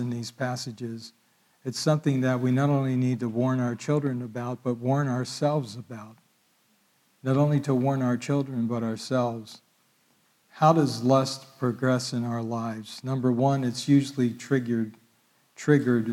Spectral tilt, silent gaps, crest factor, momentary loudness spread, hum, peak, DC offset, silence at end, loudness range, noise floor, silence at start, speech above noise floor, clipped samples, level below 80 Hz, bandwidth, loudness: -6.5 dB/octave; none; 20 dB; 12 LU; none; -8 dBFS; under 0.1%; 0 s; 3 LU; -66 dBFS; 0 s; 41 dB; under 0.1%; -74 dBFS; 14 kHz; -26 LUFS